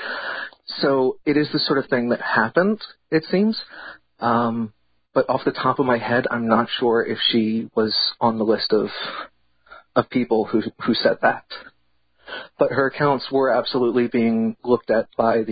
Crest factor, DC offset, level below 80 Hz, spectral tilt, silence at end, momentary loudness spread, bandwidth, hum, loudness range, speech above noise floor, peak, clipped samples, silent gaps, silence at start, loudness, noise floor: 18 dB; under 0.1%; -60 dBFS; -10.5 dB/octave; 0 s; 11 LU; 5 kHz; none; 3 LU; 47 dB; -2 dBFS; under 0.1%; none; 0 s; -21 LUFS; -67 dBFS